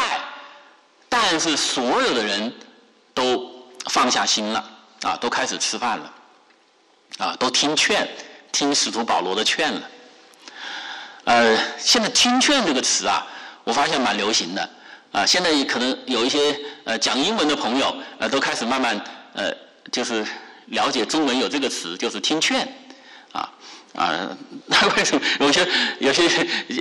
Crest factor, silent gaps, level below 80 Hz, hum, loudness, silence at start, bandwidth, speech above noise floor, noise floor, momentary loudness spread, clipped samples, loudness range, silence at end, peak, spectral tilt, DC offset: 14 dB; none; -60 dBFS; none; -20 LUFS; 0 s; 12 kHz; 37 dB; -58 dBFS; 15 LU; under 0.1%; 5 LU; 0 s; -8 dBFS; -1.5 dB/octave; under 0.1%